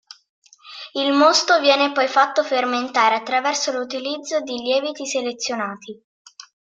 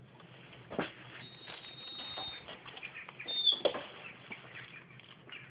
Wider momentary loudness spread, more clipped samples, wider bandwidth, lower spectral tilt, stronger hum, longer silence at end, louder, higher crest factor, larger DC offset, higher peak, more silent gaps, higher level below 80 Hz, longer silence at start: second, 13 LU vs 24 LU; neither; first, 9.4 kHz vs 5 kHz; about the same, -1 dB/octave vs -0.5 dB/octave; neither; first, 0.35 s vs 0 s; first, -19 LUFS vs -38 LUFS; second, 18 dB vs 26 dB; neither; first, -2 dBFS vs -16 dBFS; first, 6.04-6.25 s vs none; about the same, -74 dBFS vs -74 dBFS; first, 0.65 s vs 0 s